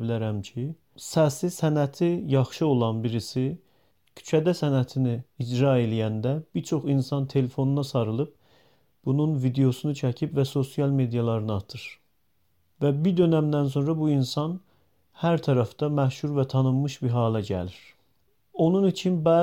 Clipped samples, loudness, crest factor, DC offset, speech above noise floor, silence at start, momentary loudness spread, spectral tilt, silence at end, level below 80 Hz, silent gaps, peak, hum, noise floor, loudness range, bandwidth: under 0.1%; -25 LUFS; 16 dB; under 0.1%; 48 dB; 0 s; 9 LU; -7.5 dB/octave; 0 s; -62 dBFS; none; -10 dBFS; none; -73 dBFS; 2 LU; 16 kHz